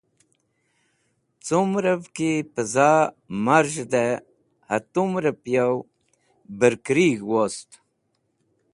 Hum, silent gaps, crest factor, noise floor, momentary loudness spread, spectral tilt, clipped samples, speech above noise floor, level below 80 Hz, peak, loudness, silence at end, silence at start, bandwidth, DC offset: none; none; 22 dB; -72 dBFS; 9 LU; -5.5 dB/octave; under 0.1%; 50 dB; -66 dBFS; -2 dBFS; -22 LUFS; 1.1 s; 1.45 s; 11.5 kHz; under 0.1%